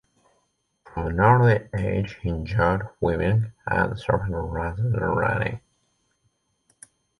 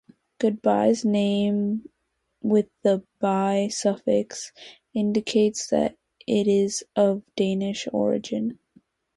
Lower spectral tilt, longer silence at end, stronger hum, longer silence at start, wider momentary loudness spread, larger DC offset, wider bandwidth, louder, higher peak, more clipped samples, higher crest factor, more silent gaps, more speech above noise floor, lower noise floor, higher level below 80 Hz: first, -8.5 dB/octave vs -5.5 dB/octave; first, 1.6 s vs 0.65 s; neither; first, 0.85 s vs 0.4 s; first, 11 LU vs 8 LU; neither; about the same, 11 kHz vs 11.5 kHz; about the same, -24 LUFS vs -24 LUFS; first, -4 dBFS vs -8 dBFS; neither; about the same, 20 dB vs 18 dB; neither; second, 48 dB vs 53 dB; second, -71 dBFS vs -76 dBFS; first, -40 dBFS vs -64 dBFS